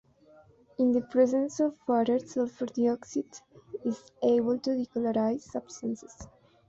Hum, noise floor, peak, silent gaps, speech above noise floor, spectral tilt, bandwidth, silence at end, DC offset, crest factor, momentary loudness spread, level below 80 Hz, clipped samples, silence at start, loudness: none; -58 dBFS; -12 dBFS; none; 30 dB; -6 dB/octave; 7.8 kHz; 0.4 s; under 0.1%; 16 dB; 14 LU; -66 dBFS; under 0.1%; 0.8 s; -29 LUFS